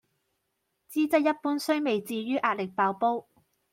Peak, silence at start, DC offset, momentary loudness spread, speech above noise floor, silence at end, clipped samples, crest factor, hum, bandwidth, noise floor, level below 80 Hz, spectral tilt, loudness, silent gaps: -10 dBFS; 0.9 s; under 0.1%; 6 LU; 52 dB; 0.5 s; under 0.1%; 18 dB; none; 16.5 kHz; -79 dBFS; -78 dBFS; -5 dB/octave; -28 LUFS; none